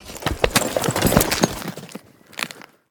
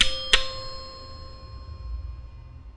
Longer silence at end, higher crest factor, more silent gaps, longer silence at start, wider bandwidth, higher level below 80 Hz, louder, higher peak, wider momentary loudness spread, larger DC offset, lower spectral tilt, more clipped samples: first, 0.3 s vs 0 s; about the same, 22 dB vs 26 dB; neither; about the same, 0 s vs 0 s; first, over 20 kHz vs 11.5 kHz; about the same, -36 dBFS vs -36 dBFS; first, -21 LUFS vs -25 LUFS; about the same, 0 dBFS vs -2 dBFS; about the same, 21 LU vs 21 LU; neither; first, -3.5 dB/octave vs -1.5 dB/octave; neither